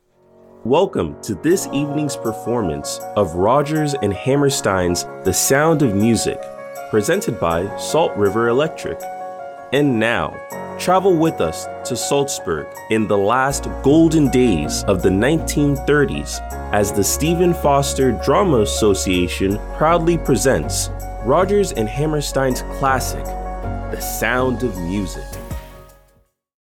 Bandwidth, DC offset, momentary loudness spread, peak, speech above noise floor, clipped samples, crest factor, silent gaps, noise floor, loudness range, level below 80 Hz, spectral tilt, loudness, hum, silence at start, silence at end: 18.5 kHz; under 0.1%; 12 LU; -2 dBFS; 41 dB; under 0.1%; 16 dB; none; -58 dBFS; 4 LU; -32 dBFS; -5 dB/octave; -18 LUFS; none; 0.65 s; 0.9 s